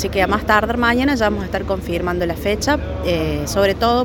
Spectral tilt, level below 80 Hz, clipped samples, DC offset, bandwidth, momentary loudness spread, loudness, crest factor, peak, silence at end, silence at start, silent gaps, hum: -5 dB/octave; -30 dBFS; under 0.1%; under 0.1%; 17 kHz; 6 LU; -18 LUFS; 18 dB; 0 dBFS; 0 s; 0 s; none; none